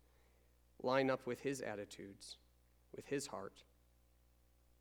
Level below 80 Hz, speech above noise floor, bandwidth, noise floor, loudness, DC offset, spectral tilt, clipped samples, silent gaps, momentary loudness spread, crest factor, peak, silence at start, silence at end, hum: -74 dBFS; 30 dB; over 20 kHz; -72 dBFS; -42 LUFS; under 0.1%; -4.5 dB/octave; under 0.1%; none; 19 LU; 24 dB; -20 dBFS; 0.8 s; 1.2 s; 60 Hz at -70 dBFS